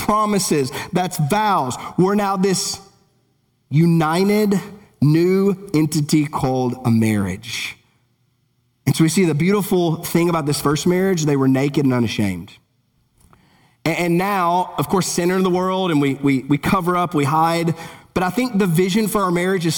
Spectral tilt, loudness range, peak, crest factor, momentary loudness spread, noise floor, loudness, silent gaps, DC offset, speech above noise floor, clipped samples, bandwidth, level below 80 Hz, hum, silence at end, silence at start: -5.5 dB/octave; 3 LU; -4 dBFS; 16 dB; 7 LU; -64 dBFS; -18 LUFS; none; under 0.1%; 47 dB; under 0.1%; 20 kHz; -50 dBFS; none; 0 s; 0 s